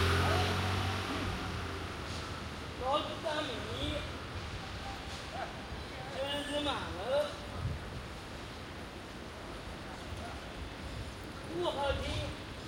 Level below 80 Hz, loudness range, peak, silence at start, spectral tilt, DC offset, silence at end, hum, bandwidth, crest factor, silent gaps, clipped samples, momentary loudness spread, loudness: -48 dBFS; 7 LU; -18 dBFS; 0 s; -5 dB/octave; under 0.1%; 0 s; none; 16 kHz; 18 dB; none; under 0.1%; 11 LU; -38 LUFS